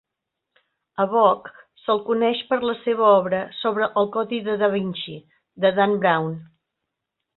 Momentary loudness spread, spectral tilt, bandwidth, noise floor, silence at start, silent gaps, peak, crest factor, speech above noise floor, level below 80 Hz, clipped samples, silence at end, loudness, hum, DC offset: 14 LU; -10 dB/octave; 4.3 kHz; -82 dBFS; 1 s; none; -4 dBFS; 18 dB; 61 dB; -66 dBFS; under 0.1%; 0.95 s; -21 LUFS; none; under 0.1%